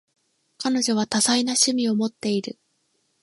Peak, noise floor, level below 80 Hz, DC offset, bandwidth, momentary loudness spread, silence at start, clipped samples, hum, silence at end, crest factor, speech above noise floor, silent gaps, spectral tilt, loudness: -6 dBFS; -70 dBFS; -70 dBFS; under 0.1%; 11.5 kHz; 9 LU; 0.6 s; under 0.1%; none; 0.7 s; 18 dB; 48 dB; none; -2.5 dB/octave; -22 LUFS